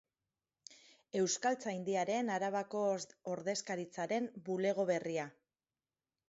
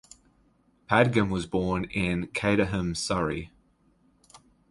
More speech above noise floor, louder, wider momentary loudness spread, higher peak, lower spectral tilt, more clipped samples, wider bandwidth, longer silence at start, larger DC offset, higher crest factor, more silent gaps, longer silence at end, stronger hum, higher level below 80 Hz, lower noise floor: first, over 53 dB vs 39 dB; second, -37 LUFS vs -27 LUFS; about the same, 9 LU vs 7 LU; second, -20 dBFS vs -6 dBFS; second, -4 dB/octave vs -5.5 dB/octave; neither; second, 8 kHz vs 11.5 kHz; second, 0.7 s vs 0.9 s; neither; second, 18 dB vs 24 dB; neither; first, 1 s vs 0.35 s; neither; second, -86 dBFS vs -48 dBFS; first, under -90 dBFS vs -65 dBFS